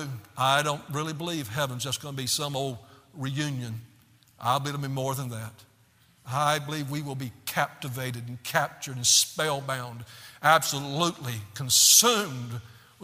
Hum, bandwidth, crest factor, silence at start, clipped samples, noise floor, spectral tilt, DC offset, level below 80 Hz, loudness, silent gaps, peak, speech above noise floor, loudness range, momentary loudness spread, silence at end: none; 16 kHz; 26 dB; 0 s; under 0.1%; -61 dBFS; -2.5 dB/octave; under 0.1%; -66 dBFS; -25 LUFS; none; -2 dBFS; 34 dB; 9 LU; 17 LU; 0 s